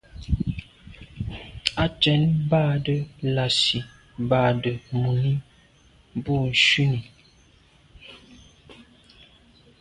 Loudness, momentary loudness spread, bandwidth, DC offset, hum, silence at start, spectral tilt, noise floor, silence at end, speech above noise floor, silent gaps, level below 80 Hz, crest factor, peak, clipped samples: -23 LUFS; 16 LU; 11 kHz; under 0.1%; none; 0.15 s; -5.5 dB/octave; -56 dBFS; 1 s; 34 dB; none; -42 dBFS; 24 dB; 0 dBFS; under 0.1%